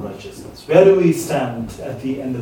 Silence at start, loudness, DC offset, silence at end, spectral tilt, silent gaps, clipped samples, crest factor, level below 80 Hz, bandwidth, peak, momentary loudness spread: 0 s; -16 LUFS; under 0.1%; 0 s; -6.5 dB/octave; none; under 0.1%; 18 dB; -48 dBFS; 18.5 kHz; 0 dBFS; 22 LU